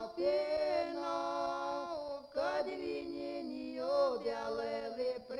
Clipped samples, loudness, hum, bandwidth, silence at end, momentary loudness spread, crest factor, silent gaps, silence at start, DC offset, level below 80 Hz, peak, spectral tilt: under 0.1%; -37 LUFS; none; 11 kHz; 0 s; 8 LU; 16 dB; none; 0 s; under 0.1%; -70 dBFS; -22 dBFS; -4.5 dB/octave